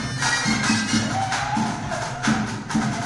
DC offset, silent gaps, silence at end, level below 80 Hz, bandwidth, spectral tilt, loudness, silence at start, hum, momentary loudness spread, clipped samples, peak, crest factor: under 0.1%; none; 0 s; -46 dBFS; 11.5 kHz; -3.5 dB/octave; -22 LUFS; 0 s; none; 5 LU; under 0.1%; -8 dBFS; 16 dB